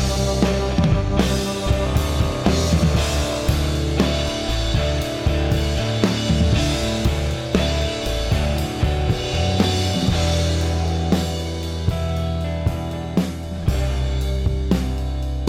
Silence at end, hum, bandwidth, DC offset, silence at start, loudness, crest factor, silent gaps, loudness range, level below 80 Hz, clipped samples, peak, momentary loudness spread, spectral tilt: 0 s; none; 16 kHz; under 0.1%; 0 s; -21 LUFS; 18 dB; none; 3 LU; -24 dBFS; under 0.1%; -2 dBFS; 5 LU; -5.5 dB/octave